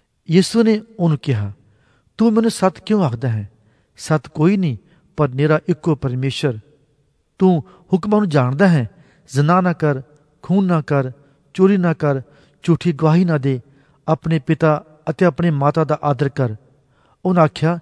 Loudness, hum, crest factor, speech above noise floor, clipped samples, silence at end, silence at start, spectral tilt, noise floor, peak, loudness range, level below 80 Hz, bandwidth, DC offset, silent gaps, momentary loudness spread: -18 LUFS; none; 18 dB; 45 dB; under 0.1%; 0 s; 0.3 s; -7.5 dB/octave; -62 dBFS; 0 dBFS; 2 LU; -54 dBFS; 11 kHz; under 0.1%; none; 11 LU